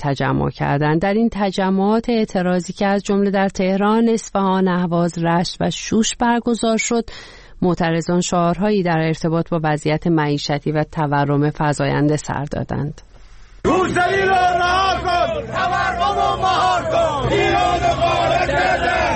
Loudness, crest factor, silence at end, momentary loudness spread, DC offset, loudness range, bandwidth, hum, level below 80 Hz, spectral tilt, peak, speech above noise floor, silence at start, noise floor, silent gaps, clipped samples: -18 LUFS; 12 dB; 0 s; 5 LU; under 0.1%; 2 LU; 8.8 kHz; none; -38 dBFS; -5.5 dB/octave; -6 dBFS; 23 dB; 0 s; -40 dBFS; none; under 0.1%